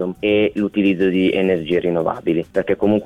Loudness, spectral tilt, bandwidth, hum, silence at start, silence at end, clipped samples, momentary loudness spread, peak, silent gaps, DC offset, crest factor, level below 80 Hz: -18 LUFS; -8 dB/octave; 9.6 kHz; none; 0 s; 0 s; under 0.1%; 4 LU; -6 dBFS; none; under 0.1%; 12 dB; -50 dBFS